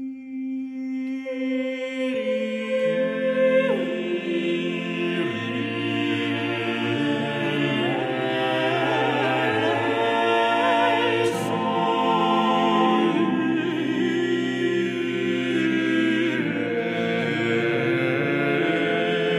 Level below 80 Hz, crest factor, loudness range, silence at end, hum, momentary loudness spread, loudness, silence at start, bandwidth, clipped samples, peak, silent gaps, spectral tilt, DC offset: -72 dBFS; 14 dB; 4 LU; 0 s; none; 7 LU; -23 LUFS; 0 s; 13 kHz; under 0.1%; -8 dBFS; none; -6 dB/octave; under 0.1%